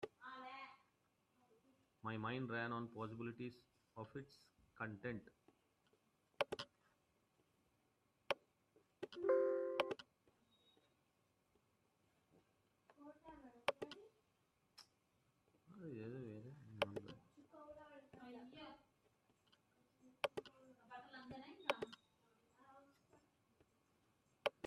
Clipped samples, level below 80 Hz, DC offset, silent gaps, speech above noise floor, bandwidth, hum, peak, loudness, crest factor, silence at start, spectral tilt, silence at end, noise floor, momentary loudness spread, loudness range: under 0.1%; -86 dBFS; under 0.1%; none; 34 dB; 12 kHz; none; -22 dBFS; -47 LUFS; 28 dB; 0 s; -5.5 dB/octave; 0 s; -82 dBFS; 20 LU; 10 LU